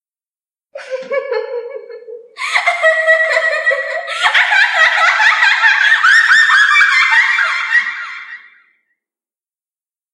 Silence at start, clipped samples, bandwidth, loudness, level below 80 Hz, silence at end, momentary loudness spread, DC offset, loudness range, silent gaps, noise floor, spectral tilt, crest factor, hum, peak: 0.75 s; under 0.1%; 12 kHz; -10 LUFS; -82 dBFS; 1.75 s; 18 LU; under 0.1%; 7 LU; none; under -90 dBFS; 3 dB/octave; 14 dB; none; 0 dBFS